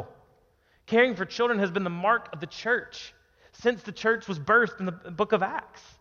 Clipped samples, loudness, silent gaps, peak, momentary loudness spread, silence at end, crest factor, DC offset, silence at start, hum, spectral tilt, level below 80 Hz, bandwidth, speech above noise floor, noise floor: under 0.1%; -26 LUFS; none; -8 dBFS; 14 LU; 0.2 s; 20 dB; under 0.1%; 0 s; none; -5.5 dB/octave; -64 dBFS; 7.2 kHz; 38 dB; -65 dBFS